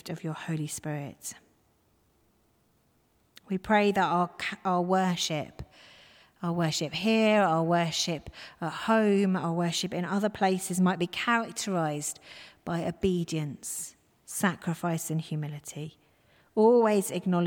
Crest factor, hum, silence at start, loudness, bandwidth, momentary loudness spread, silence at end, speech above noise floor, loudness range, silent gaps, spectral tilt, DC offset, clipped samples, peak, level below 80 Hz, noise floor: 18 dB; none; 0.05 s; -28 LUFS; 18 kHz; 15 LU; 0 s; 40 dB; 6 LU; none; -5 dB/octave; under 0.1%; under 0.1%; -12 dBFS; -60 dBFS; -68 dBFS